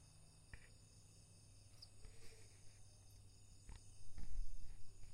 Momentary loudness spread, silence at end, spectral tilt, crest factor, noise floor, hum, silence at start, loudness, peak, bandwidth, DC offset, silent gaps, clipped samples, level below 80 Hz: 9 LU; 0 s; -3.5 dB/octave; 14 dB; -65 dBFS; none; 0 s; -62 LUFS; -32 dBFS; 11 kHz; under 0.1%; none; under 0.1%; -56 dBFS